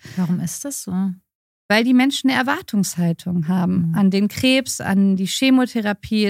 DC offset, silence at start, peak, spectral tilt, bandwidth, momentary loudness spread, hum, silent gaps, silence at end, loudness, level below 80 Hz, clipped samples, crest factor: under 0.1%; 0.05 s; -2 dBFS; -5 dB/octave; 16 kHz; 8 LU; none; 1.35-1.69 s; 0 s; -19 LUFS; -56 dBFS; under 0.1%; 16 dB